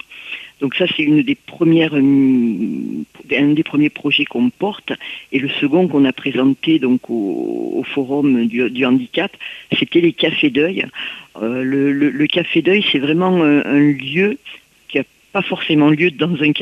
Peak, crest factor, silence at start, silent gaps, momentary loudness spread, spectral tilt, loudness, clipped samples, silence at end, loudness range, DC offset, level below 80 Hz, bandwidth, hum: -2 dBFS; 14 dB; 0.1 s; none; 10 LU; -7.5 dB/octave; -16 LUFS; under 0.1%; 0 s; 2 LU; under 0.1%; -60 dBFS; 6.4 kHz; none